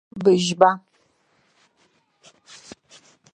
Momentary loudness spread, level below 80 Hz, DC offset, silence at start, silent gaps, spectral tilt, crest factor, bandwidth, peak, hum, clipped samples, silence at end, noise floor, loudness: 26 LU; -68 dBFS; under 0.1%; 0.15 s; none; -5 dB/octave; 24 dB; 9.6 kHz; 0 dBFS; none; under 0.1%; 2.55 s; -64 dBFS; -19 LUFS